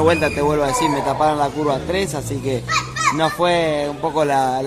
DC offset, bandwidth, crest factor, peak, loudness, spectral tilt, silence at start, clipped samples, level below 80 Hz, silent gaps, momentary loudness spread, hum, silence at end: under 0.1%; 15 kHz; 18 dB; -2 dBFS; -19 LUFS; -4.5 dB/octave; 0 s; under 0.1%; -40 dBFS; none; 5 LU; none; 0 s